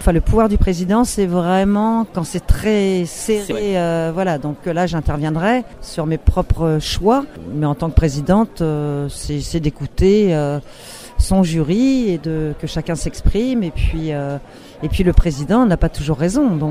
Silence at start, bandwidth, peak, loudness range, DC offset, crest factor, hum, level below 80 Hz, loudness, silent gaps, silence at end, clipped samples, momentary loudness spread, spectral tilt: 0 s; 16 kHz; 0 dBFS; 2 LU; under 0.1%; 16 dB; none; -24 dBFS; -18 LUFS; none; 0 s; under 0.1%; 8 LU; -6.5 dB/octave